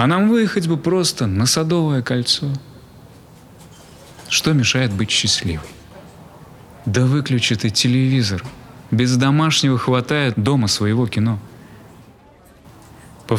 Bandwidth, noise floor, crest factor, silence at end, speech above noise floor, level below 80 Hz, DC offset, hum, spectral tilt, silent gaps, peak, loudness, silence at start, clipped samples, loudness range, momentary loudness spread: 15.5 kHz; -47 dBFS; 18 dB; 0 s; 30 dB; -50 dBFS; under 0.1%; none; -4.5 dB/octave; none; -2 dBFS; -17 LUFS; 0 s; under 0.1%; 3 LU; 8 LU